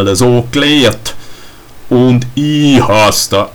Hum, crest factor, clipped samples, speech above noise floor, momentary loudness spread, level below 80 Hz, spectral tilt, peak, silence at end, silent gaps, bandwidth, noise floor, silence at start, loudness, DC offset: none; 10 dB; under 0.1%; 23 dB; 6 LU; -36 dBFS; -4.5 dB/octave; 0 dBFS; 0.05 s; none; 19.5 kHz; -32 dBFS; 0 s; -9 LUFS; under 0.1%